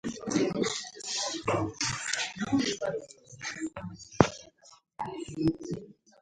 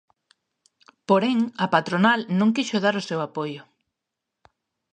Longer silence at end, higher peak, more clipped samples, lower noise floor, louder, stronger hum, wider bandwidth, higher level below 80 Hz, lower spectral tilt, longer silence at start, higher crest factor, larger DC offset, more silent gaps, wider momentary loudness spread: second, 0.3 s vs 1.3 s; about the same, 0 dBFS vs -2 dBFS; neither; second, -59 dBFS vs -84 dBFS; second, -31 LUFS vs -22 LUFS; neither; first, 11.5 kHz vs 9.2 kHz; first, -56 dBFS vs -72 dBFS; second, -4 dB/octave vs -5.5 dB/octave; second, 0.05 s vs 1.1 s; first, 32 dB vs 22 dB; neither; neither; about the same, 14 LU vs 12 LU